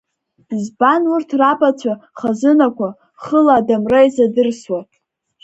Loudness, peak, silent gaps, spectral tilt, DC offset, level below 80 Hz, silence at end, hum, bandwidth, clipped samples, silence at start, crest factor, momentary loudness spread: -15 LUFS; 0 dBFS; none; -6 dB/octave; under 0.1%; -56 dBFS; 0.6 s; none; 8.2 kHz; under 0.1%; 0.5 s; 16 dB; 12 LU